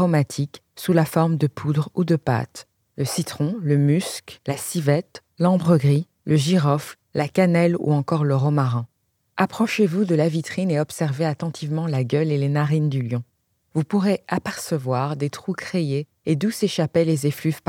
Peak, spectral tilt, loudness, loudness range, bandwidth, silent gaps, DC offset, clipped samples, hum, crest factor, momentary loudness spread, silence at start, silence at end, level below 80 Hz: -4 dBFS; -6.5 dB/octave; -22 LUFS; 4 LU; 16.5 kHz; none; under 0.1%; under 0.1%; none; 18 dB; 10 LU; 0 s; 0.1 s; -66 dBFS